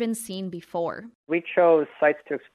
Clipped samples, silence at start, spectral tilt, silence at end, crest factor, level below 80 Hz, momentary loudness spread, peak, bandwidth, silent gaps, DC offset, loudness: under 0.1%; 0 s; -5 dB/octave; 0.15 s; 18 dB; -72 dBFS; 13 LU; -6 dBFS; 13.5 kHz; 1.15-1.24 s; under 0.1%; -24 LUFS